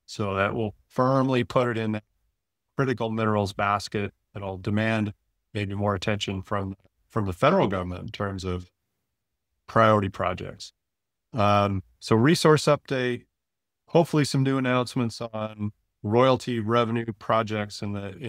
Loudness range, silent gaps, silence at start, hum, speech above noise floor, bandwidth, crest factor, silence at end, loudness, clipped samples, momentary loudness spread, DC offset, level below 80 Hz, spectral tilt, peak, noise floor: 5 LU; none; 0.1 s; none; 61 dB; 15.5 kHz; 22 dB; 0 s; -25 LUFS; under 0.1%; 14 LU; under 0.1%; -58 dBFS; -6 dB/octave; -4 dBFS; -86 dBFS